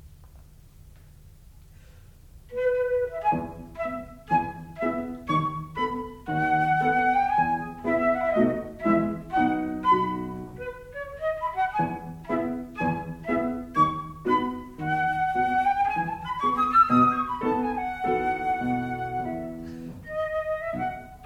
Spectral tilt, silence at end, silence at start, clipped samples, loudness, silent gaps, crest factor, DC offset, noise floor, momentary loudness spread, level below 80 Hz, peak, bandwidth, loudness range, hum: -7.5 dB/octave; 0 s; 0.05 s; under 0.1%; -26 LUFS; none; 18 dB; under 0.1%; -50 dBFS; 12 LU; -50 dBFS; -8 dBFS; 16.5 kHz; 6 LU; none